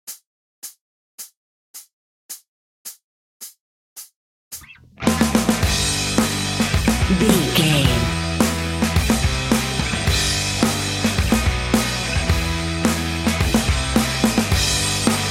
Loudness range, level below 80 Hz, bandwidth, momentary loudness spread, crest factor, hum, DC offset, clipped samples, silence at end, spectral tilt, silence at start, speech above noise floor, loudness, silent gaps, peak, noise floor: 21 LU; -30 dBFS; 17 kHz; 21 LU; 20 dB; none; under 0.1%; under 0.1%; 0 s; -4 dB/octave; 0.05 s; 23 dB; -19 LUFS; 0.26-0.62 s, 0.81-1.18 s, 1.37-1.74 s, 1.93-2.29 s, 2.48-2.85 s, 3.04-3.40 s, 3.60-3.96 s, 4.16-4.51 s; 0 dBFS; -39 dBFS